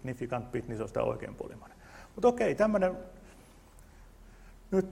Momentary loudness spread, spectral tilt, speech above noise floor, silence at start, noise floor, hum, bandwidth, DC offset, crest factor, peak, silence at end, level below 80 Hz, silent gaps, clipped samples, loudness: 23 LU; -7 dB/octave; 24 dB; 0.05 s; -55 dBFS; none; 15.5 kHz; under 0.1%; 20 dB; -12 dBFS; 0 s; -54 dBFS; none; under 0.1%; -31 LUFS